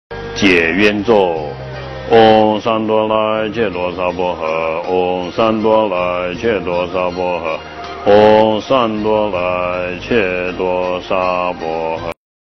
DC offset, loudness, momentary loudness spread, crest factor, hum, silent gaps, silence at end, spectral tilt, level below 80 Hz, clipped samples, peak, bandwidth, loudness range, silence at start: under 0.1%; -15 LUFS; 11 LU; 14 dB; none; none; 0.4 s; -6 dB/octave; -40 dBFS; under 0.1%; 0 dBFS; 6.4 kHz; 3 LU; 0.1 s